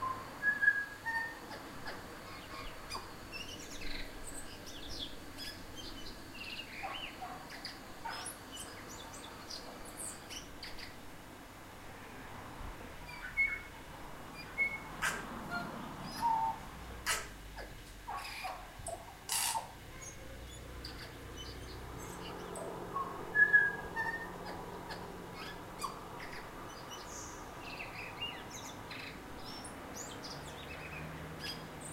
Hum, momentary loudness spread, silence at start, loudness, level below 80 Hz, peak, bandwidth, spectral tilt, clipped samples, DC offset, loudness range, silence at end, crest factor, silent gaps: none; 14 LU; 0 s; -40 LUFS; -56 dBFS; -16 dBFS; 16 kHz; -2.5 dB/octave; under 0.1%; under 0.1%; 12 LU; 0 s; 26 dB; none